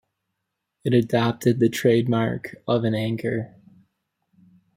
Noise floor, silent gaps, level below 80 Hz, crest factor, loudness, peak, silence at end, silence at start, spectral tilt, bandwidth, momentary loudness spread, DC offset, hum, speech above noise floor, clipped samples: -80 dBFS; none; -60 dBFS; 18 dB; -23 LUFS; -6 dBFS; 1.3 s; 0.85 s; -7 dB/octave; 16 kHz; 11 LU; under 0.1%; none; 58 dB; under 0.1%